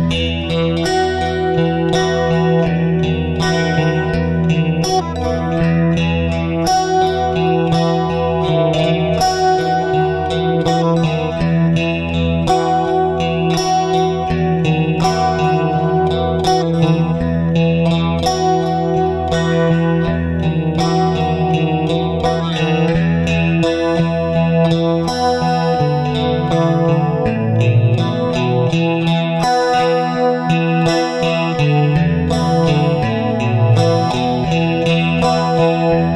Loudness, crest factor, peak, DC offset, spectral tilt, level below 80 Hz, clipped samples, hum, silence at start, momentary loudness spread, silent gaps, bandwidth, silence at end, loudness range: -15 LUFS; 14 dB; 0 dBFS; under 0.1%; -6.5 dB/octave; -34 dBFS; under 0.1%; none; 0 s; 3 LU; none; 11.5 kHz; 0 s; 1 LU